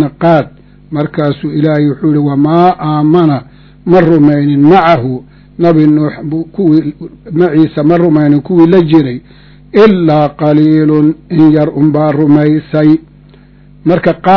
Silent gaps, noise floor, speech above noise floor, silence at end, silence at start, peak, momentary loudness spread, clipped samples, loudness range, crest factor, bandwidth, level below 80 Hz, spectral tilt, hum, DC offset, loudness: none; -38 dBFS; 30 dB; 0 s; 0 s; 0 dBFS; 11 LU; 3%; 2 LU; 8 dB; 6 kHz; -42 dBFS; -10 dB/octave; none; under 0.1%; -9 LUFS